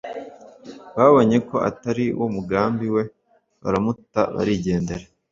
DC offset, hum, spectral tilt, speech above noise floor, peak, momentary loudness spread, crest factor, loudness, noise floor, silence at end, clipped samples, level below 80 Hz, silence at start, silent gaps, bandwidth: under 0.1%; none; -7.5 dB/octave; 22 dB; -2 dBFS; 18 LU; 20 dB; -21 LUFS; -42 dBFS; 0.3 s; under 0.1%; -50 dBFS; 0.05 s; none; 7.6 kHz